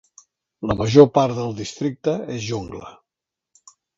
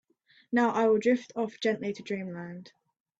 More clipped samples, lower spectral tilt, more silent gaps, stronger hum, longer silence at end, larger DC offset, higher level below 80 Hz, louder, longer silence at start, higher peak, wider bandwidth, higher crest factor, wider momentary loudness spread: neither; about the same, -6.5 dB/octave vs -6 dB/octave; neither; neither; first, 1.05 s vs 0.5 s; neither; first, -48 dBFS vs -74 dBFS; first, -20 LUFS vs -29 LUFS; about the same, 0.6 s vs 0.5 s; first, 0 dBFS vs -14 dBFS; about the same, 7.8 kHz vs 8 kHz; about the same, 20 dB vs 16 dB; about the same, 17 LU vs 16 LU